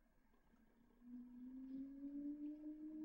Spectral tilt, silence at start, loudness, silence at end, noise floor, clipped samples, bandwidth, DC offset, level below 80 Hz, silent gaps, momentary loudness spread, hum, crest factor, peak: -8 dB/octave; 0 s; -54 LUFS; 0 s; -75 dBFS; under 0.1%; 16 kHz; under 0.1%; -76 dBFS; none; 9 LU; none; 12 dB; -42 dBFS